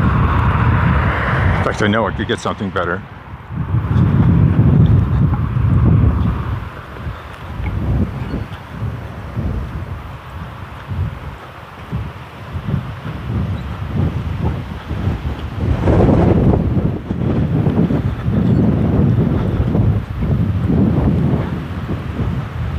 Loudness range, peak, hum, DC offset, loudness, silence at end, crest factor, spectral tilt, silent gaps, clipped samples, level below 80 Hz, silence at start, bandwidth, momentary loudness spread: 11 LU; 0 dBFS; none; under 0.1%; -17 LUFS; 0 s; 16 dB; -8.5 dB/octave; none; under 0.1%; -26 dBFS; 0 s; 9.2 kHz; 16 LU